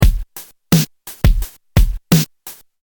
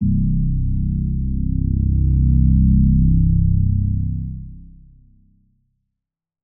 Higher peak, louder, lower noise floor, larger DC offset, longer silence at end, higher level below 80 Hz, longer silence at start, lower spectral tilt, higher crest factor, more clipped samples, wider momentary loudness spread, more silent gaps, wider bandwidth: first, 0 dBFS vs -6 dBFS; about the same, -17 LUFS vs -18 LUFS; second, -39 dBFS vs -84 dBFS; neither; second, 0.3 s vs 1.8 s; about the same, -18 dBFS vs -20 dBFS; about the same, 0 s vs 0 s; second, -5.5 dB/octave vs -21.5 dB/octave; about the same, 16 dB vs 12 dB; neither; first, 19 LU vs 9 LU; neither; first, 19.5 kHz vs 0.4 kHz